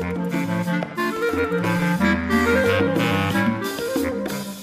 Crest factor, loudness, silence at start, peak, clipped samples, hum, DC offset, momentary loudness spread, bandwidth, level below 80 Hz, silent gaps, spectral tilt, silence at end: 16 dB; -21 LUFS; 0 s; -6 dBFS; under 0.1%; none; under 0.1%; 7 LU; 15.5 kHz; -44 dBFS; none; -6 dB/octave; 0 s